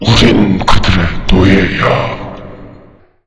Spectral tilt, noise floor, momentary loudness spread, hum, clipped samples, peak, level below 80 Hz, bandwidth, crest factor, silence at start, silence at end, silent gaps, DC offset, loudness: -6 dB/octave; -40 dBFS; 18 LU; none; 2%; 0 dBFS; -20 dBFS; 11 kHz; 10 dB; 0 s; 0.55 s; none; under 0.1%; -10 LUFS